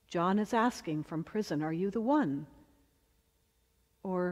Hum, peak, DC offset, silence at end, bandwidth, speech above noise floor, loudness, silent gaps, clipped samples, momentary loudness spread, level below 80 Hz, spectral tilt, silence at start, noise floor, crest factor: none; -16 dBFS; under 0.1%; 0 s; 14.5 kHz; 41 dB; -33 LUFS; none; under 0.1%; 9 LU; -68 dBFS; -6.5 dB/octave; 0.1 s; -73 dBFS; 18 dB